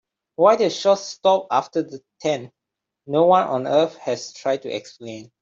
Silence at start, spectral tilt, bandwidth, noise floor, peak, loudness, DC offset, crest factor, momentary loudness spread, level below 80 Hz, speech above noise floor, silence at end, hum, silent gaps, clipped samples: 0.4 s; -5 dB/octave; 7.8 kHz; -84 dBFS; -2 dBFS; -20 LUFS; under 0.1%; 18 dB; 16 LU; -70 dBFS; 64 dB; 0.2 s; none; none; under 0.1%